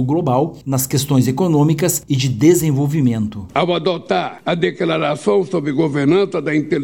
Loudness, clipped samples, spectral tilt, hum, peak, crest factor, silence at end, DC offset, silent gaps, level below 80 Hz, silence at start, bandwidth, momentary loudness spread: -17 LUFS; under 0.1%; -5.5 dB/octave; none; 0 dBFS; 16 dB; 0 s; under 0.1%; none; -50 dBFS; 0 s; 17 kHz; 5 LU